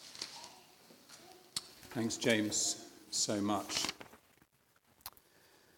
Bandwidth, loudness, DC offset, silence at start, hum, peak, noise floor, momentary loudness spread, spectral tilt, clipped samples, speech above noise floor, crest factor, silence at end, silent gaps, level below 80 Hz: 18 kHz; -36 LUFS; under 0.1%; 0 s; none; -16 dBFS; -71 dBFS; 23 LU; -2.5 dB/octave; under 0.1%; 37 dB; 24 dB; 0.7 s; none; -76 dBFS